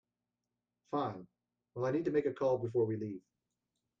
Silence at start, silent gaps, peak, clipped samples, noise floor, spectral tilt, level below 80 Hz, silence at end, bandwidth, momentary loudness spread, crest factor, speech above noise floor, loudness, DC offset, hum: 0.9 s; none; -20 dBFS; under 0.1%; -90 dBFS; -8.5 dB/octave; -76 dBFS; 0.8 s; 7.2 kHz; 16 LU; 16 dB; 55 dB; -36 LUFS; under 0.1%; 60 Hz at -65 dBFS